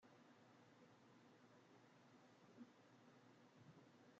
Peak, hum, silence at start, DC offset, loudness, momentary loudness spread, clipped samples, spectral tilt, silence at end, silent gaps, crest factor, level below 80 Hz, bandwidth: -50 dBFS; none; 0 s; under 0.1%; -68 LUFS; 4 LU; under 0.1%; -5 dB/octave; 0 s; none; 18 dB; under -90 dBFS; 7.4 kHz